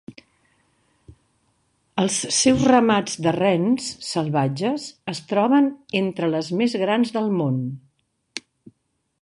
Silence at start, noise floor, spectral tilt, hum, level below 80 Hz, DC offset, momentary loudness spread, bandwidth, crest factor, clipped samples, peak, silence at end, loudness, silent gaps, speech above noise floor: 0.1 s; -72 dBFS; -4.5 dB/octave; none; -58 dBFS; under 0.1%; 15 LU; 11.5 kHz; 20 dB; under 0.1%; -2 dBFS; 0.8 s; -21 LUFS; none; 52 dB